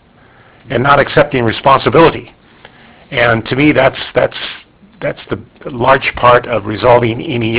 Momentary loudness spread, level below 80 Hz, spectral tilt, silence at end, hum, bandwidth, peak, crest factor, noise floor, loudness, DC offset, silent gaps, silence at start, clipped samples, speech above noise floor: 14 LU; -38 dBFS; -9.5 dB/octave; 0 s; none; 4 kHz; 0 dBFS; 12 dB; -44 dBFS; -11 LUFS; under 0.1%; none; 0.65 s; 0.5%; 33 dB